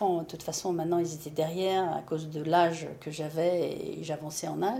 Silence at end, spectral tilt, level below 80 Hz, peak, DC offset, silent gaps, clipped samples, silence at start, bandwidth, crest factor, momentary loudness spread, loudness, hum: 0 s; -5 dB/octave; -68 dBFS; -12 dBFS; under 0.1%; none; under 0.1%; 0 s; 16.5 kHz; 18 dB; 10 LU; -31 LUFS; none